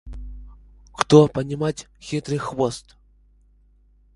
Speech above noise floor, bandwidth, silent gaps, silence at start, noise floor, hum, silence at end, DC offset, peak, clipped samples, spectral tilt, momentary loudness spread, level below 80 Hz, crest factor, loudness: 36 dB; 11.5 kHz; none; 0.05 s; -56 dBFS; 50 Hz at -40 dBFS; 1.35 s; under 0.1%; 0 dBFS; under 0.1%; -6.5 dB/octave; 24 LU; -44 dBFS; 24 dB; -21 LUFS